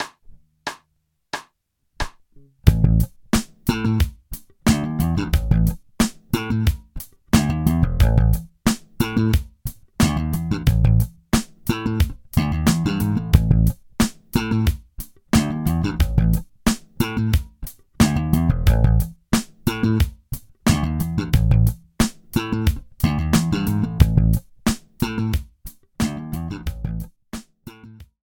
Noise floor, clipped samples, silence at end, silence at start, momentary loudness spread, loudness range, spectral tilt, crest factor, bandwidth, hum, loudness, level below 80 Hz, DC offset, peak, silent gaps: -70 dBFS; under 0.1%; 0.2 s; 0 s; 15 LU; 2 LU; -6 dB/octave; 20 dB; 17.5 kHz; none; -21 LUFS; -26 dBFS; under 0.1%; 0 dBFS; none